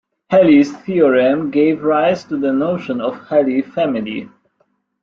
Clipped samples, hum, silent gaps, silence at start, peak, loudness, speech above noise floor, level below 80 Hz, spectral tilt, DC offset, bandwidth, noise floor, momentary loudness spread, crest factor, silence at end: under 0.1%; none; none; 0.3 s; -2 dBFS; -15 LUFS; 49 dB; -60 dBFS; -7.5 dB/octave; under 0.1%; 7.2 kHz; -64 dBFS; 10 LU; 14 dB; 0.75 s